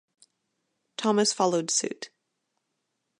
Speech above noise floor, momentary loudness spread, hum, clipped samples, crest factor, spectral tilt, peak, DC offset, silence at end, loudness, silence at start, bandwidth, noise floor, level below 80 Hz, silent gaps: 54 dB; 18 LU; none; under 0.1%; 20 dB; -3 dB/octave; -10 dBFS; under 0.1%; 1.1 s; -25 LUFS; 1 s; 11.5 kHz; -80 dBFS; -82 dBFS; none